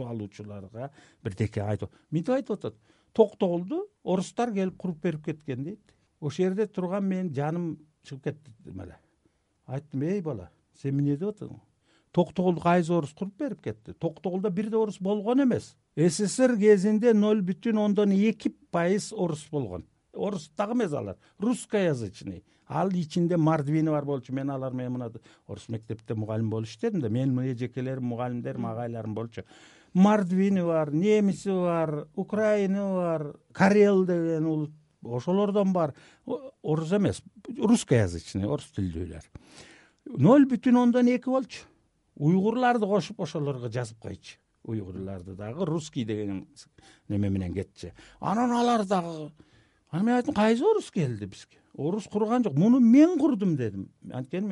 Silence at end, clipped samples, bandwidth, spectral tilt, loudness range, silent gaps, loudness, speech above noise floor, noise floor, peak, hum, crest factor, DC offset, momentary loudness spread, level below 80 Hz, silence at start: 0 s; under 0.1%; 11.5 kHz; -7 dB/octave; 9 LU; none; -27 LUFS; 43 dB; -70 dBFS; -8 dBFS; none; 20 dB; under 0.1%; 17 LU; -62 dBFS; 0 s